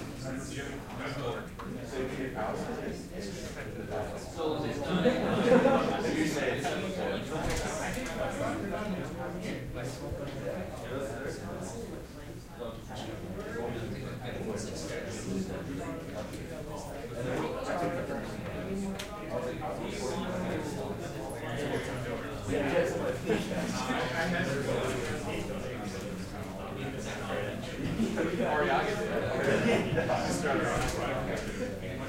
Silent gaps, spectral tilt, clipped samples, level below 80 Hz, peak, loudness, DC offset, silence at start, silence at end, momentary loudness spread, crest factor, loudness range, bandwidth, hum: none; -5.5 dB/octave; under 0.1%; -48 dBFS; -12 dBFS; -34 LUFS; under 0.1%; 0 s; 0 s; 11 LU; 22 dB; 9 LU; 16 kHz; none